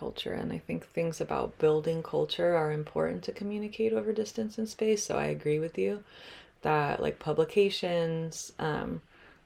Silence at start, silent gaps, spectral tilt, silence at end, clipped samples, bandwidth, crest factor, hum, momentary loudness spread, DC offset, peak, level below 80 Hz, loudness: 0 s; none; -5 dB/octave; 0.2 s; under 0.1%; 15 kHz; 18 dB; none; 9 LU; under 0.1%; -14 dBFS; -60 dBFS; -31 LUFS